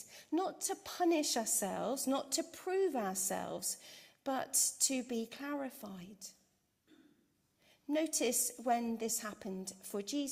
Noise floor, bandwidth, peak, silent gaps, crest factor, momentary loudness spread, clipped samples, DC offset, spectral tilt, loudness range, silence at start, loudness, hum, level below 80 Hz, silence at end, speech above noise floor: -76 dBFS; 16 kHz; -16 dBFS; none; 22 dB; 14 LU; under 0.1%; under 0.1%; -2 dB/octave; 5 LU; 0 s; -36 LUFS; none; -80 dBFS; 0 s; 39 dB